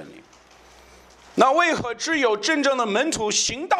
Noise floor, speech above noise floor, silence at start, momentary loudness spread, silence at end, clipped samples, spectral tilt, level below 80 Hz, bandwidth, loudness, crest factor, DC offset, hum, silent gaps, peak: -51 dBFS; 30 dB; 0 s; 6 LU; 0 s; under 0.1%; -2 dB/octave; -56 dBFS; 13 kHz; -21 LUFS; 20 dB; under 0.1%; none; none; -4 dBFS